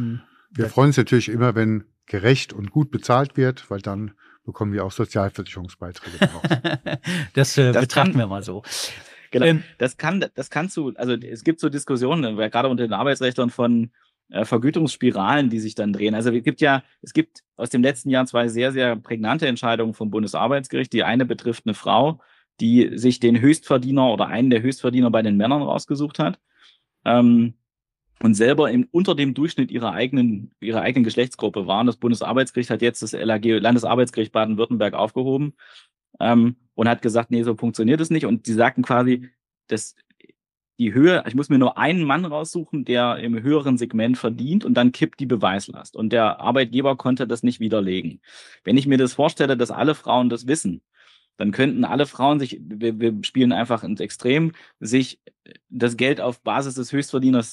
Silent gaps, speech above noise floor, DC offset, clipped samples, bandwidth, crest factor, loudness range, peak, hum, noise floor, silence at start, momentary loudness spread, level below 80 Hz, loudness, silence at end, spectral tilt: 17.48-17.52 s; 59 dB; under 0.1%; under 0.1%; 12.5 kHz; 18 dB; 3 LU; -2 dBFS; none; -79 dBFS; 0 s; 10 LU; -64 dBFS; -21 LUFS; 0 s; -6 dB/octave